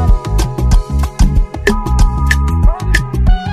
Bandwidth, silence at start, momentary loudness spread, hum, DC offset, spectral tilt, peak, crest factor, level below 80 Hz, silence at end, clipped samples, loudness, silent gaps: 13.5 kHz; 0 s; 3 LU; none; under 0.1%; -6 dB/octave; 0 dBFS; 10 dB; -12 dBFS; 0 s; under 0.1%; -14 LUFS; none